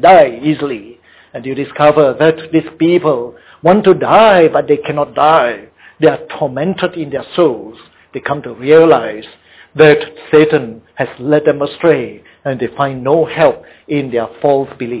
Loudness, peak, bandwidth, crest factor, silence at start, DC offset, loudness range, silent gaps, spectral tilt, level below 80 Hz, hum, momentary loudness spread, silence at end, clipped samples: -12 LUFS; 0 dBFS; 4 kHz; 12 dB; 0 s; under 0.1%; 4 LU; none; -10 dB/octave; -50 dBFS; none; 16 LU; 0 s; 0.2%